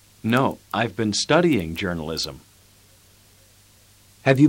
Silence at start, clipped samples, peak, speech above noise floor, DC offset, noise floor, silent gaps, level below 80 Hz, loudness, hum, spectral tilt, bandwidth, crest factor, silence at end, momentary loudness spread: 0.25 s; under 0.1%; -4 dBFS; 32 dB; under 0.1%; -54 dBFS; none; -52 dBFS; -23 LUFS; none; -5 dB/octave; 16.5 kHz; 20 dB; 0 s; 9 LU